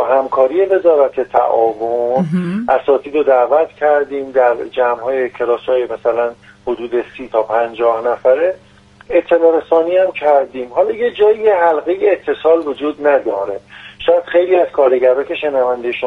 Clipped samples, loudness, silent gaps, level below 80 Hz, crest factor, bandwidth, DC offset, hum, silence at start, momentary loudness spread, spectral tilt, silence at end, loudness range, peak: under 0.1%; -14 LUFS; none; -54 dBFS; 14 dB; 4.9 kHz; under 0.1%; none; 0 s; 7 LU; -7.5 dB/octave; 0 s; 3 LU; 0 dBFS